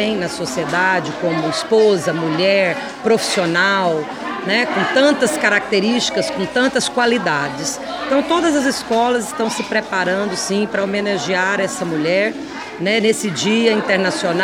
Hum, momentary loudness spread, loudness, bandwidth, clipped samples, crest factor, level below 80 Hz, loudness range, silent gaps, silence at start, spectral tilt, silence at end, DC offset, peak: none; 7 LU; -17 LUFS; 19.5 kHz; under 0.1%; 16 dB; -54 dBFS; 2 LU; none; 0 s; -3.5 dB/octave; 0 s; under 0.1%; 0 dBFS